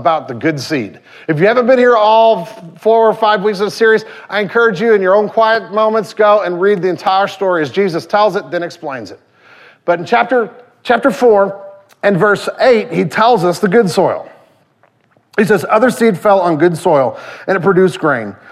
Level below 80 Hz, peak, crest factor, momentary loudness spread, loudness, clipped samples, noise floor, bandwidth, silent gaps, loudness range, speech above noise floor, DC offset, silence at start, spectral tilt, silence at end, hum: -58 dBFS; 0 dBFS; 12 dB; 10 LU; -12 LUFS; under 0.1%; -54 dBFS; 14.5 kHz; none; 4 LU; 42 dB; under 0.1%; 0 s; -6 dB/octave; 0.15 s; none